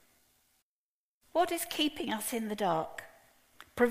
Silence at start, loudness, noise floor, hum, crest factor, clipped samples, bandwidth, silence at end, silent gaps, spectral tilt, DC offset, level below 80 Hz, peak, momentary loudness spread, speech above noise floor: 1.35 s; -33 LUFS; under -90 dBFS; none; 22 dB; under 0.1%; 15.5 kHz; 0 s; none; -3 dB/octave; under 0.1%; -68 dBFS; -12 dBFS; 11 LU; over 57 dB